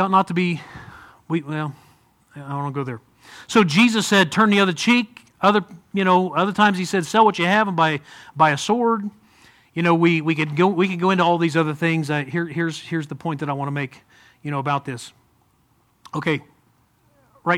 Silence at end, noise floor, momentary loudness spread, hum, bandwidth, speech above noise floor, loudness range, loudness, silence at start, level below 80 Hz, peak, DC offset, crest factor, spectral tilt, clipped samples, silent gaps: 0 s; -62 dBFS; 15 LU; none; 15.5 kHz; 42 dB; 10 LU; -20 LUFS; 0 s; -64 dBFS; -2 dBFS; under 0.1%; 20 dB; -5.5 dB/octave; under 0.1%; none